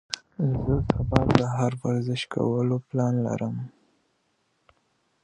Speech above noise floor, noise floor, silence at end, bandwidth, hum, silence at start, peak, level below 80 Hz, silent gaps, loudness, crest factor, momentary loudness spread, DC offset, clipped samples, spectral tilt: 47 dB; -71 dBFS; 1.55 s; 10 kHz; none; 0.1 s; 0 dBFS; -42 dBFS; none; -26 LUFS; 26 dB; 9 LU; under 0.1%; under 0.1%; -7 dB/octave